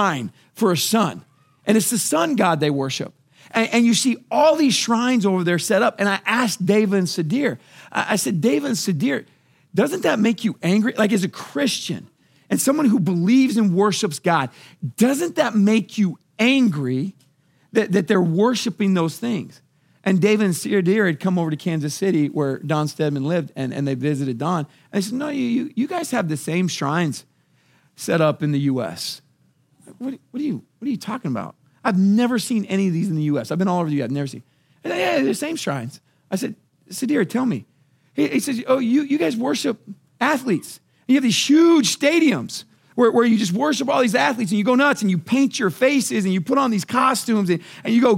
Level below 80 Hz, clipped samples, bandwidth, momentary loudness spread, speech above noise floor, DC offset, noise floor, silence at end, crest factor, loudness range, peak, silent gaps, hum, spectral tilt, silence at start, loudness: -74 dBFS; under 0.1%; 16.5 kHz; 11 LU; 41 dB; under 0.1%; -61 dBFS; 0 s; 18 dB; 6 LU; -2 dBFS; none; none; -5 dB/octave; 0 s; -20 LUFS